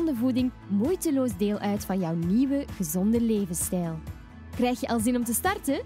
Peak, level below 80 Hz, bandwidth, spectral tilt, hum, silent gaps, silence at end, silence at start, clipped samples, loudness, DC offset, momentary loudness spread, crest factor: -12 dBFS; -48 dBFS; 16 kHz; -5.5 dB/octave; none; none; 0 s; 0 s; under 0.1%; -27 LUFS; under 0.1%; 6 LU; 14 dB